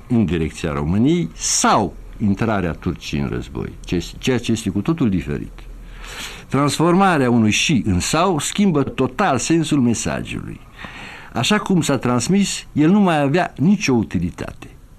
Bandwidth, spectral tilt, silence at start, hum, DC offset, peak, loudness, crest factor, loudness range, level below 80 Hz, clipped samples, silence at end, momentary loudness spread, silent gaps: 14.5 kHz; -5 dB/octave; 0.05 s; none; under 0.1%; -6 dBFS; -18 LUFS; 14 dB; 5 LU; -38 dBFS; under 0.1%; 0.2 s; 15 LU; none